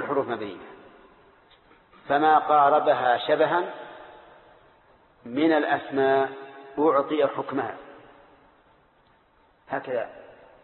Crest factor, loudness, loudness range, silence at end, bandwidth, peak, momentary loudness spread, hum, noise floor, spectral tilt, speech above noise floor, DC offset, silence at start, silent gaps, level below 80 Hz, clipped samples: 18 dB; -24 LUFS; 6 LU; 0.35 s; 4.3 kHz; -8 dBFS; 19 LU; none; -61 dBFS; -9.5 dB/octave; 38 dB; under 0.1%; 0 s; none; -70 dBFS; under 0.1%